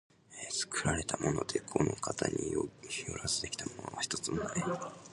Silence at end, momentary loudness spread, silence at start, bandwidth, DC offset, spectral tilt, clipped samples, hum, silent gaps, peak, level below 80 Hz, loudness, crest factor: 0 s; 7 LU; 0.3 s; 11.5 kHz; under 0.1%; -3.5 dB/octave; under 0.1%; none; none; -12 dBFS; -56 dBFS; -35 LUFS; 24 dB